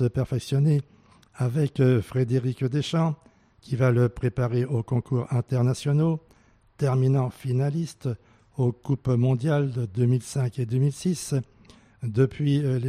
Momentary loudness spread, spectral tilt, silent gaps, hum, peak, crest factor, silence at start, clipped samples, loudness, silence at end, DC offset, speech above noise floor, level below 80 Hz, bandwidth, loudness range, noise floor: 8 LU; -7.5 dB/octave; none; none; -10 dBFS; 16 dB; 0 s; under 0.1%; -25 LUFS; 0 s; under 0.1%; 35 dB; -54 dBFS; 12 kHz; 1 LU; -59 dBFS